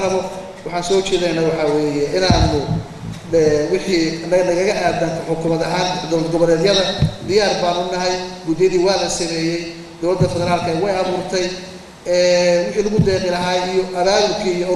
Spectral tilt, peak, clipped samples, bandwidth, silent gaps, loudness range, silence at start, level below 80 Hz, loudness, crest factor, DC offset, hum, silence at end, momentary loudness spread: -5 dB/octave; 0 dBFS; under 0.1%; 12.5 kHz; none; 2 LU; 0 s; -36 dBFS; -17 LUFS; 16 dB; under 0.1%; none; 0 s; 9 LU